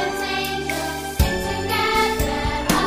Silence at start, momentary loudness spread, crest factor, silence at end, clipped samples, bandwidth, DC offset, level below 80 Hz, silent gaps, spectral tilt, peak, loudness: 0 s; 6 LU; 20 dB; 0 s; under 0.1%; 16 kHz; under 0.1%; -30 dBFS; none; -4 dB/octave; -2 dBFS; -22 LUFS